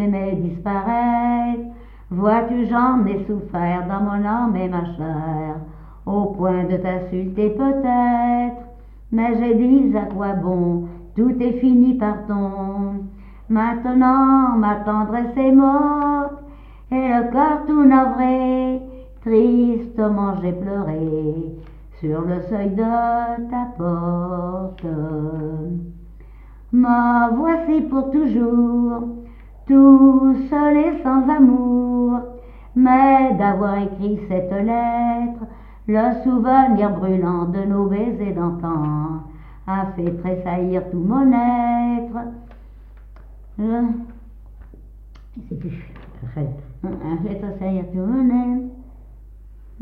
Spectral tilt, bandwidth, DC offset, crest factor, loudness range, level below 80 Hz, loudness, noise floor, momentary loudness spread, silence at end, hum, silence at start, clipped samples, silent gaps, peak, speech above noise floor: -11.5 dB/octave; 4.3 kHz; under 0.1%; 18 dB; 9 LU; -40 dBFS; -19 LUFS; -40 dBFS; 15 LU; 0 s; none; 0 s; under 0.1%; none; -2 dBFS; 23 dB